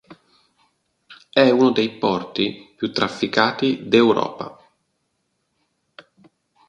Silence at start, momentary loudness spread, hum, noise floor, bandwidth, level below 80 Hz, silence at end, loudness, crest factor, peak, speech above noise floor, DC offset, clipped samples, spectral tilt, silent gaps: 0.1 s; 12 LU; none; -72 dBFS; 9.8 kHz; -62 dBFS; 2.2 s; -19 LUFS; 22 dB; 0 dBFS; 53 dB; under 0.1%; under 0.1%; -5.5 dB/octave; none